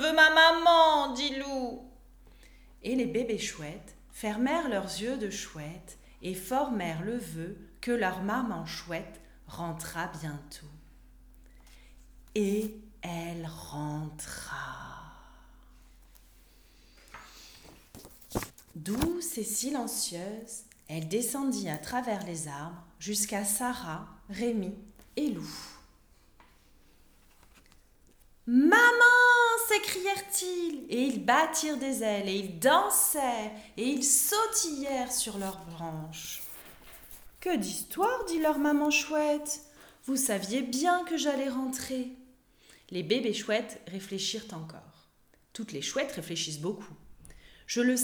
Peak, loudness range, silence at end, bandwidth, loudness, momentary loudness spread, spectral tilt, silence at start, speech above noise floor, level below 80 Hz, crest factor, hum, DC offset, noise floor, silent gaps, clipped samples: -8 dBFS; 16 LU; 0 s; over 20 kHz; -29 LUFS; 20 LU; -2.5 dB/octave; 0 s; 35 dB; -58 dBFS; 22 dB; none; under 0.1%; -65 dBFS; none; under 0.1%